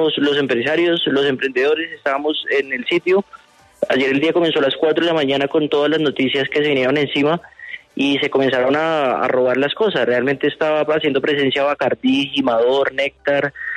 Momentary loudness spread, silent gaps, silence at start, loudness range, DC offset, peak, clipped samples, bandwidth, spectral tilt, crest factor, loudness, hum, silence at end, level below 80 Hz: 4 LU; none; 0 s; 2 LU; under 0.1%; -2 dBFS; under 0.1%; 9.8 kHz; -5.5 dB/octave; 14 dB; -17 LUFS; none; 0 s; -60 dBFS